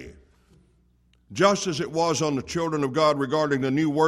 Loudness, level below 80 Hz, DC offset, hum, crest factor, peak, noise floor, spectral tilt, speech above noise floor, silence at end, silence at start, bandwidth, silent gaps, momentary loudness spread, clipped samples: -24 LUFS; -58 dBFS; under 0.1%; 60 Hz at -55 dBFS; 18 dB; -6 dBFS; -62 dBFS; -5 dB/octave; 39 dB; 0 s; 0 s; 14 kHz; none; 6 LU; under 0.1%